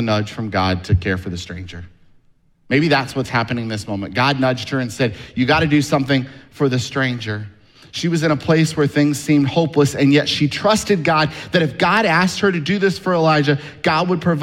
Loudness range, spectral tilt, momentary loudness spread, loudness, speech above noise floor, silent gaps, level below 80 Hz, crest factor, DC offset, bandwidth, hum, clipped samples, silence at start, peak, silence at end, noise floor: 5 LU; -5.5 dB/octave; 9 LU; -18 LUFS; 37 dB; none; -44 dBFS; 16 dB; under 0.1%; 16 kHz; none; under 0.1%; 0 s; 0 dBFS; 0 s; -55 dBFS